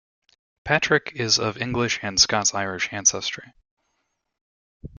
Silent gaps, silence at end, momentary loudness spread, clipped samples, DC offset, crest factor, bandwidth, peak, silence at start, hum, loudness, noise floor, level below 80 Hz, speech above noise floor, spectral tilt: 3.71-3.77 s, 4.41-4.80 s; 0.1 s; 11 LU; under 0.1%; under 0.1%; 22 dB; 11 kHz; -2 dBFS; 0.65 s; none; -21 LUFS; -75 dBFS; -54 dBFS; 52 dB; -2 dB/octave